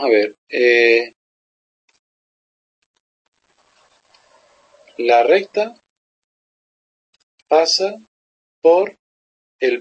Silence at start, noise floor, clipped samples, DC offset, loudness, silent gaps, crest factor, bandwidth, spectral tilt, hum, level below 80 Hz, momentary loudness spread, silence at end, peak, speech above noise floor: 0 s; -60 dBFS; under 0.1%; under 0.1%; -16 LUFS; 0.38-0.47 s, 1.16-1.88 s, 1.99-2.94 s, 3.00-3.32 s, 5.90-7.13 s, 7.23-7.46 s, 8.08-8.62 s, 8.99-9.59 s; 18 dB; 8.6 kHz; -2 dB/octave; none; -78 dBFS; 13 LU; 0 s; -2 dBFS; 45 dB